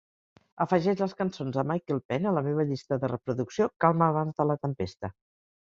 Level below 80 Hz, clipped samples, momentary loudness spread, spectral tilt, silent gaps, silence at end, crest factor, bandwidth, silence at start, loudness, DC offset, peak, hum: -60 dBFS; under 0.1%; 8 LU; -8 dB/octave; 2.05-2.09 s, 3.76-3.80 s; 0.65 s; 22 dB; 7.6 kHz; 0.55 s; -28 LUFS; under 0.1%; -6 dBFS; none